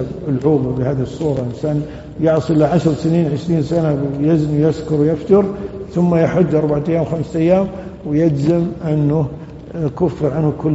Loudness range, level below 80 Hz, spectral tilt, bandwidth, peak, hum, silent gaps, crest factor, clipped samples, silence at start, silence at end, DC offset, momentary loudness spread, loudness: 2 LU; -40 dBFS; -9 dB/octave; 8 kHz; 0 dBFS; none; none; 16 dB; under 0.1%; 0 s; 0 s; under 0.1%; 8 LU; -17 LUFS